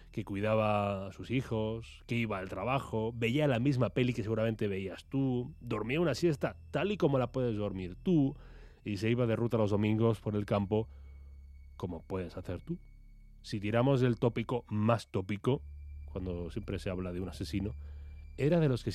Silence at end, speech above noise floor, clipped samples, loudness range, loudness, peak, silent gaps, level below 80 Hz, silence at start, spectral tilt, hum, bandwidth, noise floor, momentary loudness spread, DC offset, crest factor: 0 s; 22 dB; under 0.1%; 5 LU; -33 LUFS; -14 dBFS; none; -52 dBFS; 0 s; -7.5 dB/octave; none; 13.5 kHz; -54 dBFS; 14 LU; under 0.1%; 20 dB